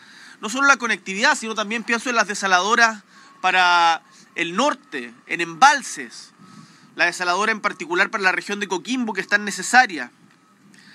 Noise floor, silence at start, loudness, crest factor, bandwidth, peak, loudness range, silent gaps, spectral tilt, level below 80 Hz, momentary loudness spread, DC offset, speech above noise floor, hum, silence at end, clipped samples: -53 dBFS; 0.2 s; -19 LUFS; 22 dB; 14.5 kHz; 0 dBFS; 3 LU; none; -2 dB/octave; under -90 dBFS; 16 LU; under 0.1%; 33 dB; none; 0.85 s; under 0.1%